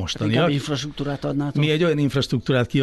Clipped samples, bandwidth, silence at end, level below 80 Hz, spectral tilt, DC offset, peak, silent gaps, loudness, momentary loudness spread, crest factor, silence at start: under 0.1%; 12 kHz; 0 s; -46 dBFS; -6 dB/octave; under 0.1%; -8 dBFS; none; -22 LUFS; 7 LU; 14 dB; 0 s